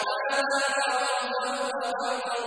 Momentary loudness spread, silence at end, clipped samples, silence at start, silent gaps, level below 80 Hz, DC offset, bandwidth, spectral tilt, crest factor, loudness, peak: 5 LU; 0 s; under 0.1%; 0 s; none; -76 dBFS; under 0.1%; 10.5 kHz; 0 dB/octave; 14 dB; -27 LUFS; -14 dBFS